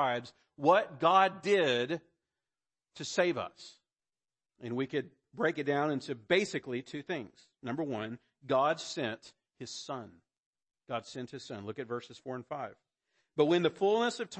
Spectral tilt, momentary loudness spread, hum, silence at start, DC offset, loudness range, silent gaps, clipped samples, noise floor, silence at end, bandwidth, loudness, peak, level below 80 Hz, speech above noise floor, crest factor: -4.5 dB/octave; 16 LU; none; 0 s; under 0.1%; 12 LU; 10.38-10.53 s; under 0.1%; under -90 dBFS; 0 s; 8.8 kHz; -32 LUFS; -12 dBFS; -78 dBFS; over 58 dB; 22 dB